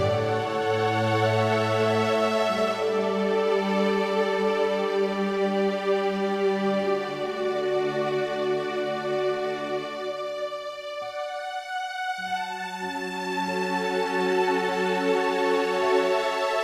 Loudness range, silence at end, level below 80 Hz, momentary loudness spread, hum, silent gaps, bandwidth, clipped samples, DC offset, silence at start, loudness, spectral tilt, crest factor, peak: 7 LU; 0 s; -66 dBFS; 8 LU; none; none; 15 kHz; under 0.1%; under 0.1%; 0 s; -26 LUFS; -5.5 dB/octave; 14 dB; -10 dBFS